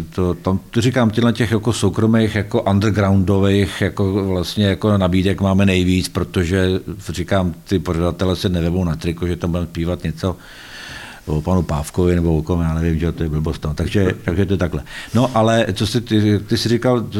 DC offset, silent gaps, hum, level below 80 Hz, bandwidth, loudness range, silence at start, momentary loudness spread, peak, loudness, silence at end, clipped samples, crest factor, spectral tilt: under 0.1%; none; none; -34 dBFS; 16.5 kHz; 5 LU; 0 s; 7 LU; -4 dBFS; -18 LUFS; 0 s; under 0.1%; 14 dB; -6.5 dB/octave